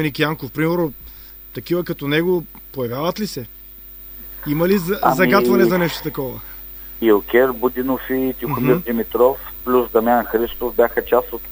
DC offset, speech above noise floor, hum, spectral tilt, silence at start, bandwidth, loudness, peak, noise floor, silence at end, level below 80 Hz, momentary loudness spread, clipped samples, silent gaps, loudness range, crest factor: under 0.1%; 20 dB; none; -6.5 dB/octave; 0 s; over 20 kHz; -18 LUFS; 0 dBFS; -38 dBFS; 0 s; -42 dBFS; 18 LU; under 0.1%; none; 6 LU; 18 dB